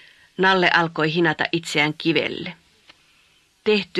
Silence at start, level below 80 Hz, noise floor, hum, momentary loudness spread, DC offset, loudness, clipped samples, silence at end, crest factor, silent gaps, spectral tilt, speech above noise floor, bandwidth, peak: 0.4 s; -64 dBFS; -59 dBFS; none; 12 LU; under 0.1%; -20 LUFS; under 0.1%; 0 s; 22 dB; none; -5 dB/octave; 39 dB; 12.5 kHz; 0 dBFS